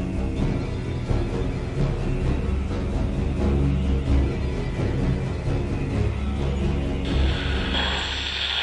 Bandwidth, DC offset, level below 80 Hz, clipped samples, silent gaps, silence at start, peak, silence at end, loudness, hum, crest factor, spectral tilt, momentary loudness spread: 10.5 kHz; under 0.1%; -28 dBFS; under 0.1%; none; 0 s; -10 dBFS; 0 s; -25 LUFS; none; 14 dB; -6.5 dB/octave; 4 LU